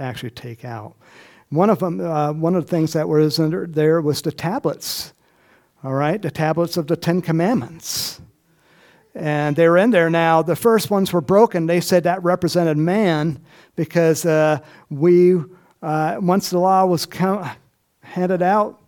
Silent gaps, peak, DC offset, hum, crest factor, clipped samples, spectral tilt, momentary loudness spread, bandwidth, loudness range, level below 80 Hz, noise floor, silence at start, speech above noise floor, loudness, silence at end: none; 0 dBFS; under 0.1%; none; 18 dB; under 0.1%; -6 dB/octave; 15 LU; 19 kHz; 5 LU; -60 dBFS; -56 dBFS; 0 s; 38 dB; -18 LUFS; 0.15 s